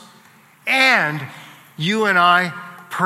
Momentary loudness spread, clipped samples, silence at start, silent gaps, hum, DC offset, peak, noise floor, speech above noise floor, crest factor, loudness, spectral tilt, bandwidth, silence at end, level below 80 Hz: 17 LU; under 0.1%; 0.65 s; none; none; under 0.1%; 0 dBFS; -49 dBFS; 32 dB; 20 dB; -16 LUFS; -4 dB/octave; 16 kHz; 0 s; -74 dBFS